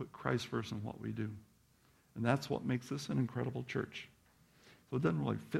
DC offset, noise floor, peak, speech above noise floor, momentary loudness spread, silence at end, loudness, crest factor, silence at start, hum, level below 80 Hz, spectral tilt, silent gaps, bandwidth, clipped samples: under 0.1%; -69 dBFS; -16 dBFS; 32 dB; 10 LU; 0 s; -38 LUFS; 24 dB; 0 s; none; -68 dBFS; -6.5 dB/octave; none; 14.5 kHz; under 0.1%